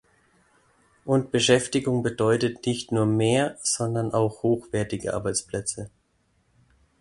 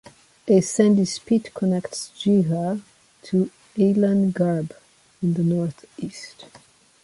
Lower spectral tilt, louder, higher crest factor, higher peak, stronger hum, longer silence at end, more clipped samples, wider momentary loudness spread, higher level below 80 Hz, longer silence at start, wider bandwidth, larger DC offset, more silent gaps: second, -4.5 dB/octave vs -6.5 dB/octave; about the same, -24 LUFS vs -22 LUFS; about the same, 20 dB vs 18 dB; about the same, -6 dBFS vs -6 dBFS; neither; first, 1.15 s vs 0.6 s; neither; second, 9 LU vs 16 LU; first, -56 dBFS vs -62 dBFS; first, 1.05 s vs 0.45 s; about the same, 11.5 kHz vs 11.5 kHz; neither; neither